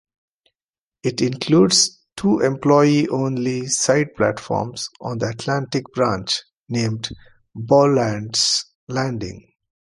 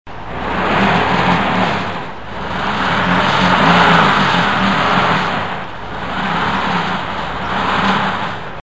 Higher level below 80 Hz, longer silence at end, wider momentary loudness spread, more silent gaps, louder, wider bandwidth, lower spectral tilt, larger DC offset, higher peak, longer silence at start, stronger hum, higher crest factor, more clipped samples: second, -54 dBFS vs -38 dBFS; first, 0.5 s vs 0 s; about the same, 13 LU vs 13 LU; first, 6.57-6.64 s, 8.75-8.87 s vs none; second, -19 LUFS vs -15 LUFS; first, 11.5 kHz vs 8 kHz; second, -4 dB/octave vs -5.5 dB/octave; second, under 0.1% vs 3%; about the same, -2 dBFS vs 0 dBFS; first, 1.05 s vs 0.05 s; neither; about the same, 18 dB vs 16 dB; neither